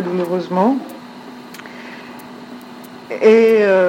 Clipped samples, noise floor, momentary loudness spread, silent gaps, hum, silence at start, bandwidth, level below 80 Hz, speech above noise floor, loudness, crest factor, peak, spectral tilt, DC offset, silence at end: under 0.1%; -36 dBFS; 24 LU; none; none; 0 s; 16.5 kHz; -70 dBFS; 22 dB; -14 LUFS; 16 dB; 0 dBFS; -6.5 dB/octave; under 0.1%; 0 s